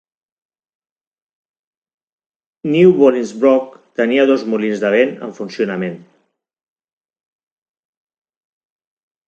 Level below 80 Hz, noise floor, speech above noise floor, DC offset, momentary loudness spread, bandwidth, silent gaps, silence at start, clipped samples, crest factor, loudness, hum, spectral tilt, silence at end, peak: -66 dBFS; -63 dBFS; 49 dB; under 0.1%; 15 LU; 8.2 kHz; none; 2.65 s; under 0.1%; 18 dB; -15 LUFS; none; -7 dB/octave; 3.3 s; 0 dBFS